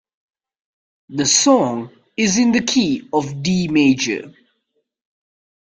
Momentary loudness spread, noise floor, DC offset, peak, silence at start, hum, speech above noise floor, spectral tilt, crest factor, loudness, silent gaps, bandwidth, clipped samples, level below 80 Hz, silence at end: 12 LU; -71 dBFS; under 0.1%; -2 dBFS; 1.1 s; none; 54 dB; -3.5 dB/octave; 18 dB; -17 LUFS; none; 10 kHz; under 0.1%; -56 dBFS; 1.4 s